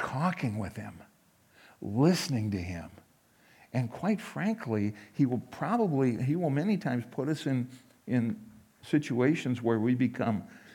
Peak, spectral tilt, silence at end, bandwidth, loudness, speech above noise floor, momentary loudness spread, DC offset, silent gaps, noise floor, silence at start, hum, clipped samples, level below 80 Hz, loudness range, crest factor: -12 dBFS; -7 dB/octave; 0 s; 17.5 kHz; -31 LUFS; 33 dB; 12 LU; under 0.1%; none; -63 dBFS; 0 s; none; under 0.1%; -70 dBFS; 3 LU; 18 dB